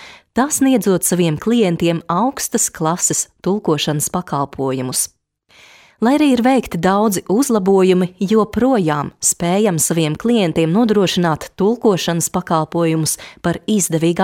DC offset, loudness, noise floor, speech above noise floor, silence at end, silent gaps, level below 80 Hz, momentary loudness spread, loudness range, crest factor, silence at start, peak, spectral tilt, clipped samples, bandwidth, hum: under 0.1%; -16 LUFS; -50 dBFS; 34 dB; 0 s; none; -48 dBFS; 6 LU; 3 LU; 14 dB; 0 s; -2 dBFS; -4.5 dB/octave; under 0.1%; 17 kHz; none